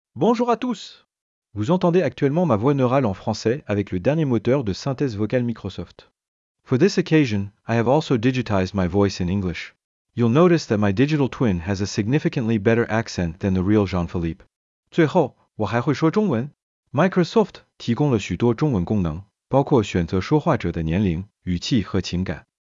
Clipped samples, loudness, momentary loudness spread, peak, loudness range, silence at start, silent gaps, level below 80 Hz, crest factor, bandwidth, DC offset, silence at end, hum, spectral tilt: under 0.1%; -21 LUFS; 10 LU; -4 dBFS; 2 LU; 0.15 s; 1.21-1.42 s, 6.28-6.55 s, 9.84-10.05 s, 14.56-14.83 s, 16.63-16.83 s; -50 dBFS; 16 dB; 7.6 kHz; under 0.1%; 0.4 s; none; -7 dB/octave